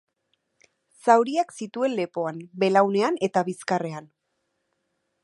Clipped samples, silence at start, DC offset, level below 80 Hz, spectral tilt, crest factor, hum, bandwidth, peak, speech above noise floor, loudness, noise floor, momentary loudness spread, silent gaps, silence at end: under 0.1%; 1.05 s; under 0.1%; -80 dBFS; -5.5 dB/octave; 22 dB; none; 11.5 kHz; -4 dBFS; 53 dB; -24 LUFS; -76 dBFS; 11 LU; none; 1.2 s